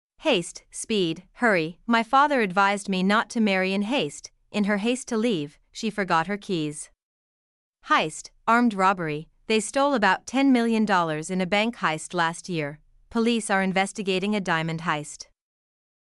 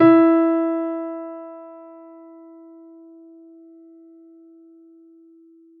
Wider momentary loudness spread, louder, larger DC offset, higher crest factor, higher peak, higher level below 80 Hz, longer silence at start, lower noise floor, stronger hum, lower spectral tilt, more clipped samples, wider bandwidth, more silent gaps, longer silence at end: second, 10 LU vs 30 LU; second, -24 LUFS vs -19 LUFS; neither; about the same, 18 dB vs 20 dB; second, -8 dBFS vs -4 dBFS; first, -60 dBFS vs -78 dBFS; first, 0.2 s vs 0 s; first, under -90 dBFS vs -51 dBFS; neither; second, -4.5 dB/octave vs -6.5 dB/octave; neither; first, 12 kHz vs 4.3 kHz; first, 7.03-7.73 s vs none; second, 0.9 s vs 4 s